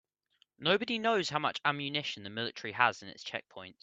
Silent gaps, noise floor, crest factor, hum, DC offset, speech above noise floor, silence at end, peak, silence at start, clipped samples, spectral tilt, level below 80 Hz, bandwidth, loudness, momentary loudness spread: none; -73 dBFS; 26 dB; none; under 0.1%; 40 dB; 0.1 s; -8 dBFS; 0.6 s; under 0.1%; -4 dB/octave; -76 dBFS; 8.6 kHz; -32 LUFS; 11 LU